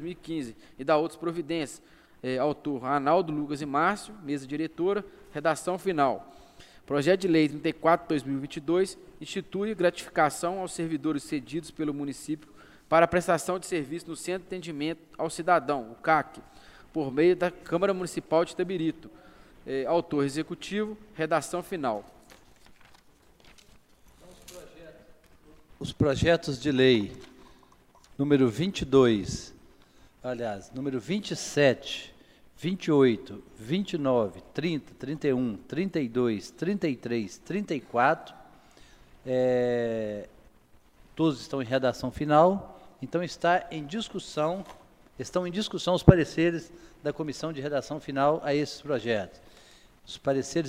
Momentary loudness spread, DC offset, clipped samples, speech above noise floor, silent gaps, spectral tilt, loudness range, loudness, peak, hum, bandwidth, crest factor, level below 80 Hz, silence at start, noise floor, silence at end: 14 LU; under 0.1%; under 0.1%; 31 dB; none; -6 dB/octave; 4 LU; -28 LUFS; 0 dBFS; none; 15.5 kHz; 28 dB; -52 dBFS; 0 s; -58 dBFS; 0 s